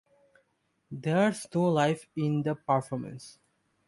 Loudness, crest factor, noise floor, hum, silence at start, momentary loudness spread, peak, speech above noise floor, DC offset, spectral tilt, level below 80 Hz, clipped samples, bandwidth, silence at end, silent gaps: -29 LUFS; 18 dB; -74 dBFS; none; 0.9 s; 18 LU; -12 dBFS; 46 dB; under 0.1%; -6.5 dB/octave; -70 dBFS; under 0.1%; 11.5 kHz; 0.55 s; none